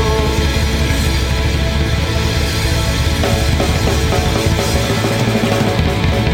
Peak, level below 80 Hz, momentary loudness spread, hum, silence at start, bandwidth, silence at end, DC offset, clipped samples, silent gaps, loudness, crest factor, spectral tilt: -2 dBFS; -20 dBFS; 2 LU; none; 0 s; 17 kHz; 0 s; under 0.1%; under 0.1%; none; -15 LUFS; 12 dB; -5 dB/octave